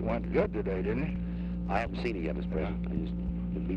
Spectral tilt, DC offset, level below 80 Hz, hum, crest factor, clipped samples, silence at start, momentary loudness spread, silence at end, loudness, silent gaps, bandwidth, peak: -9 dB/octave; under 0.1%; -38 dBFS; none; 18 dB; under 0.1%; 0 s; 5 LU; 0 s; -33 LUFS; none; 5.8 kHz; -14 dBFS